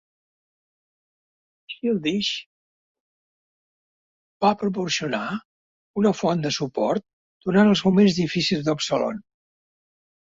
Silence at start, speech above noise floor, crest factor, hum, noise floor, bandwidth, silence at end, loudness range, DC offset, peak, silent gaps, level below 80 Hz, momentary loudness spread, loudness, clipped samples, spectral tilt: 1.7 s; over 68 dB; 20 dB; none; under -90 dBFS; 7.8 kHz; 1.05 s; 9 LU; under 0.1%; -4 dBFS; 2.46-4.40 s, 5.45-5.94 s, 7.13-7.40 s; -62 dBFS; 14 LU; -22 LUFS; under 0.1%; -5.5 dB/octave